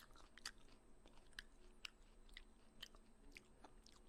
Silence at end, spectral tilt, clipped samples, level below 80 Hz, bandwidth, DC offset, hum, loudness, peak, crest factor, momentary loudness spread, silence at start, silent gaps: 0 s; -1.5 dB/octave; under 0.1%; -68 dBFS; 13 kHz; under 0.1%; none; -60 LUFS; -30 dBFS; 32 dB; 10 LU; 0 s; none